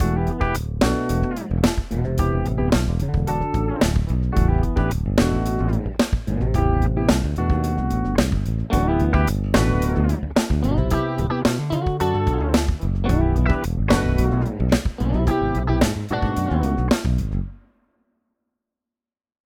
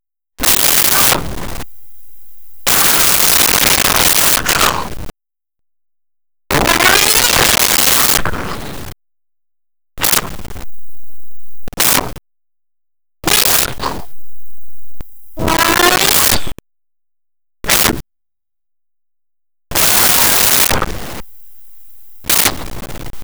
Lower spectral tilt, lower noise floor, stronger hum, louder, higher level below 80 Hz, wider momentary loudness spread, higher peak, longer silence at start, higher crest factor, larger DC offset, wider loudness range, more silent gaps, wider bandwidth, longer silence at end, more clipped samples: first, -6.5 dB/octave vs -1 dB/octave; about the same, -89 dBFS vs under -90 dBFS; neither; second, -21 LUFS vs -10 LUFS; first, -26 dBFS vs -34 dBFS; second, 4 LU vs 20 LU; second, -4 dBFS vs 0 dBFS; about the same, 0 s vs 0 s; about the same, 16 dB vs 16 dB; neither; second, 2 LU vs 7 LU; neither; second, 17.5 kHz vs over 20 kHz; first, 1.9 s vs 0 s; neither